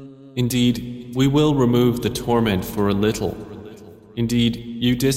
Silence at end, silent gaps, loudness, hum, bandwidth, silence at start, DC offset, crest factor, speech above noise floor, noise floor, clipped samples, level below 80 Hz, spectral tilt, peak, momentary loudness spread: 0 s; none; -20 LUFS; none; 16 kHz; 0 s; under 0.1%; 14 dB; 22 dB; -41 dBFS; under 0.1%; -42 dBFS; -6 dB/octave; -6 dBFS; 16 LU